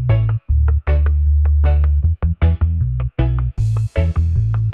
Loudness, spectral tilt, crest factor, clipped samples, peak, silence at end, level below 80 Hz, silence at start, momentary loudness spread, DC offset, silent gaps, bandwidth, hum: -17 LUFS; -9.5 dB/octave; 12 dB; under 0.1%; -4 dBFS; 0 s; -18 dBFS; 0 s; 4 LU; 0.1%; none; 3.7 kHz; none